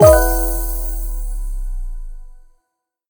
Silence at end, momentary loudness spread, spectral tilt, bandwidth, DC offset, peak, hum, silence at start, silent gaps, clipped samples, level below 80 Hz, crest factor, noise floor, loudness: 0.7 s; 20 LU; -5.5 dB/octave; over 20 kHz; under 0.1%; 0 dBFS; none; 0 s; none; under 0.1%; -22 dBFS; 18 dB; -75 dBFS; -19 LUFS